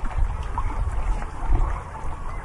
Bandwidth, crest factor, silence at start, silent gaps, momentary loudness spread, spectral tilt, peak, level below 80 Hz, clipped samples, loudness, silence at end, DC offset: 11 kHz; 16 dB; 0 s; none; 8 LU; -6.5 dB/octave; -8 dBFS; -24 dBFS; under 0.1%; -30 LUFS; 0 s; under 0.1%